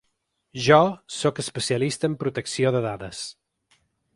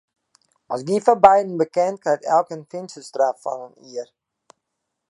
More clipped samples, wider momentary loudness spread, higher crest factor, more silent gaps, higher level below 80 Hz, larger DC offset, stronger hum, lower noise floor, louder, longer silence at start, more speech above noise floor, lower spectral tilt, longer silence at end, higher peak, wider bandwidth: neither; second, 16 LU vs 20 LU; about the same, 22 dB vs 22 dB; neither; about the same, -58 dBFS vs -62 dBFS; neither; neither; second, -75 dBFS vs -79 dBFS; second, -23 LUFS vs -19 LUFS; second, 0.55 s vs 0.7 s; second, 52 dB vs 59 dB; about the same, -4.5 dB/octave vs -5.5 dB/octave; second, 0.85 s vs 1.05 s; about the same, -2 dBFS vs 0 dBFS; about the same, 11.5 kHz vs 11.5 kHz